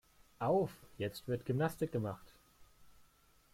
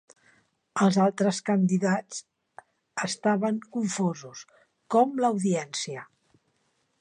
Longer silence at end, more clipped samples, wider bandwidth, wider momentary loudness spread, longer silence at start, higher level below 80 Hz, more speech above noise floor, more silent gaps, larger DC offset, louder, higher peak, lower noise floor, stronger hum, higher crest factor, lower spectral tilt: second, 0.65 s vs 0.95 s; neither; first, 16.5 kHz vs 10.5 kHz; second, 9 LU vs 17 LU; second, 0.4 s vs 0.75 s; first, -66 dBFS vs -76 dBFS; second, 31 dB vs 47 dB; neither; neither; second, -38 LUFS vs -26 LUFS; second, -22 dBFS vs -8 dBFS; second, -68 dBFS vs -72 dBFS; neither; about the same, 18 dB vs 18 dB; first, -7 dB/octave vs -5.5 dB/octave